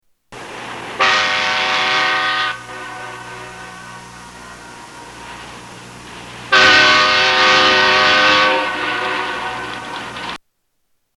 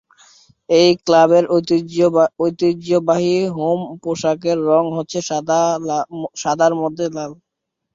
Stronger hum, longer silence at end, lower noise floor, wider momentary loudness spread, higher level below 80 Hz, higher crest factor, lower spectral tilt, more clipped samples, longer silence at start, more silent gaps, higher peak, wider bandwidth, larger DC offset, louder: first, 60 Hz at -45 dBFS vs none; first, 0.8 s vs 0.6 s; first, -67 dBFS vs -50 dBFS; first, 25 LU vs 10 LU; first, -52 dBFS vs -60 dBFS; about the same, 18 dB vs 16 dB; second, -1.5 dB/octave vs -5.5 dB/octave; neither; second, 0.3 s vs 0.7 s; neither; about the same, 0 dBFS vs -2 dBFS; first, 12.5 kHz vs 7.6 kHz; neither; first, -12 LUFS vs -17 LUFS